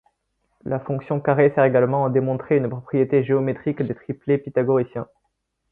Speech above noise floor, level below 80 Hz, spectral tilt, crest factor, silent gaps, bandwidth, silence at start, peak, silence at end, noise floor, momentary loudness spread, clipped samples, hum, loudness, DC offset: 53 dB; -60 dBFS; -12 dB/octave; 18 dB; none; 3.9 kHz; 0.65 s; -2 dBFS; 0.65 s; -74 dBFS; 11 LU; under 0.1%; none; -21 LUFS; under 0.1%